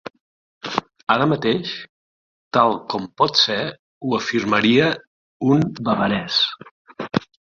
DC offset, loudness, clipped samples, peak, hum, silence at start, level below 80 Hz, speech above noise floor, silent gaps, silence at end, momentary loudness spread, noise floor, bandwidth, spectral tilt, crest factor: under 0.1%; -20 LUFS; under 0.1%; 0 dBFS; none; 0.05 s; -56 dBFS; over 71 dB; 0.21-0.61 s, 1.89-2.51 s, 3.79-4.01 s, 5.07-5.40 s, 6.71-6.85 s; 0.3 s; 14 LU; under -90 dBFS; 7.4 kHz; -5 dB/octave; 20 dB